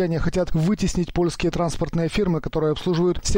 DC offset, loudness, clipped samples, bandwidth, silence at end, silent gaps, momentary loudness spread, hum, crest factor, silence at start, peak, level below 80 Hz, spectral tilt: under 0.1%; -23 LUFS; under 0.1%; 16 kHz; 0 s; none; 2 LU; none; 10 dB; 0 s; -12 dBFS; -32 dBFS; -6 dB/octave